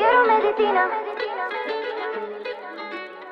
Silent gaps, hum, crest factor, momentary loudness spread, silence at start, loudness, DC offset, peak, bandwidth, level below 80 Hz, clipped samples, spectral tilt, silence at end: none; none; 16 dB; 15 LU; 0 s; -23 LUFS; under 0.1%; -6 dBFS; 5.8 kHz; -66 dBFS; under 0.1%; -4.5 dB/octave; 0 s